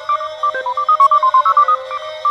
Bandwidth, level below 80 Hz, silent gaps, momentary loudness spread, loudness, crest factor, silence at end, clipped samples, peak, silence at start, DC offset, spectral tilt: 8.2 kHz; -66 dBFS; none; 9 LU; -13 LUFS; 12 dB; 0 s; under 0.1%; -2 dBFS; 0 s; under 0.1%; -1 dB/octave